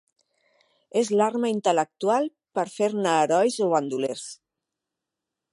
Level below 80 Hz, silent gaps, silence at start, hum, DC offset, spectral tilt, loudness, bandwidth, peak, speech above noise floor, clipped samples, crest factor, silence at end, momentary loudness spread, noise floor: -80 dBFS; none; 0.95 s; none; under 0.1%; -4.5 dB/octave; -24 LUFS; 11.5 kHz; -8 dBFS; 62 dB; under 0.1%; 18 dB; 1.2 s; 8 LU; -86 dBFS